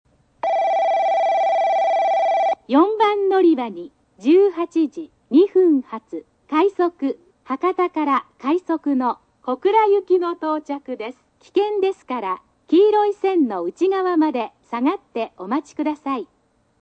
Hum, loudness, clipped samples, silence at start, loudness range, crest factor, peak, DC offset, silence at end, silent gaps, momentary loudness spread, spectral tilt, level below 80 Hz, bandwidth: none; -20 LUFS; under 0.1%; 0.45 s; 4 LU; 16 dB; -4 dBFS; under 0.1%; 0.55 s; none; 13 LU; -5.5 dB/octave; -68 dBFS; 8.2 kHz